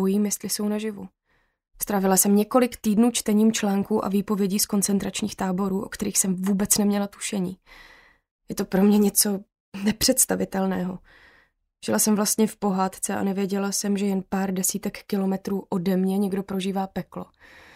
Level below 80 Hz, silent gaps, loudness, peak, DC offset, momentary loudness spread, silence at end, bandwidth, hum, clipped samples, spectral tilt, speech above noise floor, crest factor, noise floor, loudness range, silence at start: -54 dBFS; 8.31-8.39 s, 9.60-9.72 s; -23 LUFS; -4 dBFS; under 0.1%; 12 LU; 0.5 s; 16 kHz; none; under 0.1%; -4.5 dB/octave; 38 dB; 20 dB; -62 dBFS; 4 LU; 0 s